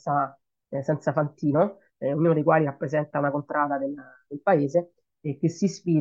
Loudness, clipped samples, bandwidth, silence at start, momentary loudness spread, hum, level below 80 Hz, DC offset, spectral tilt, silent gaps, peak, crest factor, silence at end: -25 LUFS; under 0.1%; 7.6 kHz; 0.05 s; 12 LU; none; -72 dBFS; under 0.1%; -8 dB/octave; none; -8 dBFS; 18 dB; 0 s